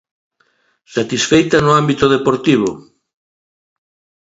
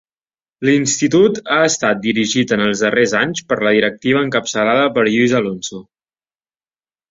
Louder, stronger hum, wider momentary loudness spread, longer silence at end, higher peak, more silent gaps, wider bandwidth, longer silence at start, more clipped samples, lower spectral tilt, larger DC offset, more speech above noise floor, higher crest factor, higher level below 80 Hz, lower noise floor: about the same, -14 LUFS vs -15 LUFS; neither; first, 10 LU vs 5 LU; about the same, 1.4 s vs 1.3 s; about the same, 0 dBFS vs 0 dBFS; neither; about the same, 8 kHz vs 7.8 kHz; first, 0.9 s vs 0.6 s; neither; about the same, -5 dB/octave vs -4 dB/octave; neither; second, 47 dB vs over 75 dB; about the same, 16 dB vs 16 dB; first, -46 dBFS vs -56 dBFS; second, -60 dBFS vs under -90 dBFS